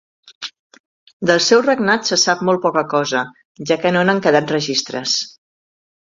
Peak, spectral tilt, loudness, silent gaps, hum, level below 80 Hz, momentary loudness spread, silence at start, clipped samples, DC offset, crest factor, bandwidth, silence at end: 0 dBFS; -3.5 dB/octave; -16 LUFS; 0.35-0.41 s, 0.59-0.70 s, 0.80-1.07 s, 1.13-1.20 s, 3.45-3.55 s; none; -62 dBFS; 18 LU; 0.25 s; under 0.1%; under 0.1%; 18 dB; 7.8 kHz; 0.85 s